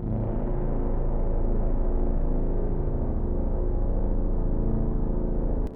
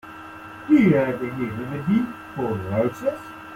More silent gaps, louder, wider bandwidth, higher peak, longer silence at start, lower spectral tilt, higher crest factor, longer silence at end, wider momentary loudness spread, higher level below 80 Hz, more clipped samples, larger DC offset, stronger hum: neither; second, -30 LUFS vs -23 LUFS; second, 2.1 kHz vs 15.5 kHz; second, -14 dBFS vs -6 dBFS; about the same, 0 s vs 0.05 s; first, -12 dB/octave vs -8.5 dB/octave; second, 10 dB vs 18 dB; about the same, 0 s vs 0 s; second, 1 LU vs 20 LU; first, -24 dBFS vs -56 dBFS; neither; neither; neither